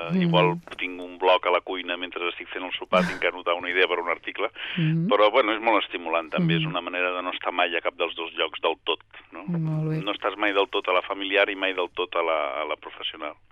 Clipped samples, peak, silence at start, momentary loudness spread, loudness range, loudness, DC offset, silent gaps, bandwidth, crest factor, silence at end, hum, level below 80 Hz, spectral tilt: under 0.1%; -8 dBFS; 0 s; 10 LU; 3 LU; -25 LUFS; under 0.1%; none; 8 kHz; 18 dB; 0.2 s; none; -62 dBFS; -7 dB/octave